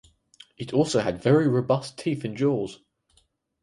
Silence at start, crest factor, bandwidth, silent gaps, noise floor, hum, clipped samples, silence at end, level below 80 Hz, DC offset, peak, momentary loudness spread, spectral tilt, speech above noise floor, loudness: 0.6 s; 18 dB; 11.5 kHz; none; -66 dBFS; none; under 0.1%; 0.85 s; -60 dBFS; under 0.1%; -8 dBFS; 9 LU; -6.5 dB/octave; 43 dB; -24 LUFS